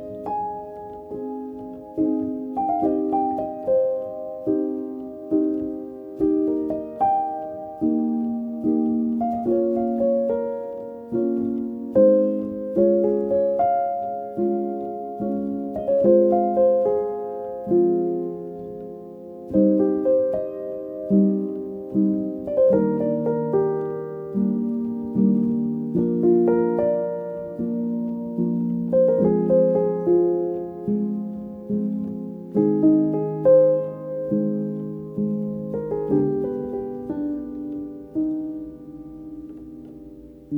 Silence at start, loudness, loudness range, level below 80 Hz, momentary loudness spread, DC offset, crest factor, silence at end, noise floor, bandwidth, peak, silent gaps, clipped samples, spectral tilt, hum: 0 s; -23 LUFS; 5 LU; -56 dBFS; 15 LU; under 0.1%; 16 dB; 0 s; -42 dBFS; 2.8 kHz; -6 dBFS; none; under 0.1%; -12 dB/octave; none